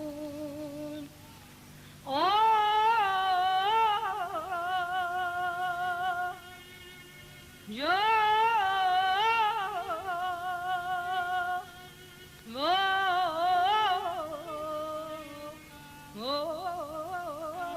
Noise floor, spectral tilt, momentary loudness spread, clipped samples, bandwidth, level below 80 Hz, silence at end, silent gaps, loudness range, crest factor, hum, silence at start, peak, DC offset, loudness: -51 dBFS; -3 dB/octave; 22 LU; under 0.1%; 16 kHz; -64 dBFS; 0 s; none; 7 LU; 14 dB; none; 0 s; -16 dBFS; under 0.1%; -29 LUFS